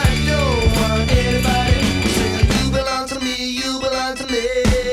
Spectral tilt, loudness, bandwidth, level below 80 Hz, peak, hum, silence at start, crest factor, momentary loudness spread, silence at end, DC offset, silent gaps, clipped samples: -5 dB/octave; -18 LUFS; 16 kHz; -24 dBFS; -2 dBFS; none; 0 s; 16 dB; 5 LU; 0 s; under 0.1%; none; under 0.1%